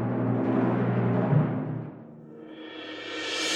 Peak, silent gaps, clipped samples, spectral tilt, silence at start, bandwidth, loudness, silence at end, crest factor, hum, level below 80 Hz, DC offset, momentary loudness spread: -12 dBFS; none; under 0.1%; -6 dB/octave; 0 s; 11.5 kHz; -27 LUFS; 0 s; 16 dB; none; -66 dBFS; under 0.1%; 20 LU